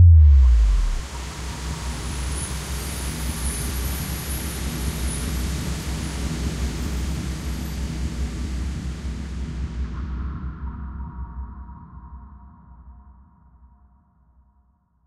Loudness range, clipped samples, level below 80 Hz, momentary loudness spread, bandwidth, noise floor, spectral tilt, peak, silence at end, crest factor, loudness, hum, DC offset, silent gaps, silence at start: 12 LU; under 0.1%; -24 dBFS; 12 LU; 14.5 kHz; -62 dBFS; -5 dB/octave; -4 dBFS; 1.95 s; 18 dB; -25 LUFS; none; under 0.1%; none; 0 s